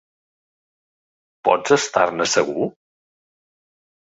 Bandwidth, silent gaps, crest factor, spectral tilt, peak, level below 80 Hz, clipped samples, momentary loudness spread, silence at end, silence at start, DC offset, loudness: 8 kHz; none; 22 dB; -3 dB/octave; -2 dBFS; -64 dBFS; under 0.1%; 8 LU; 1.4 s; 1.45 s; under 0.1%; -19 LUFS